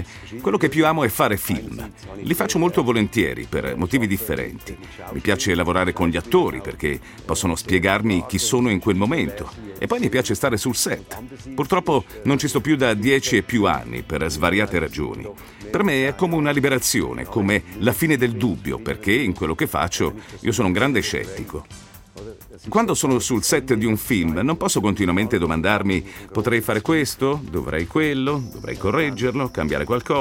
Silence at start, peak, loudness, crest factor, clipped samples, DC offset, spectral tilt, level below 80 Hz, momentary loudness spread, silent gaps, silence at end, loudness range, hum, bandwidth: 0 s; -2 dBFS; -21 LUFS; 20 dB; under 0.1%; under 0.1%; -4.5 dB/octave; -44 dBFS; 12 LU; none; 0 s; 2 LU; none; 17 kHz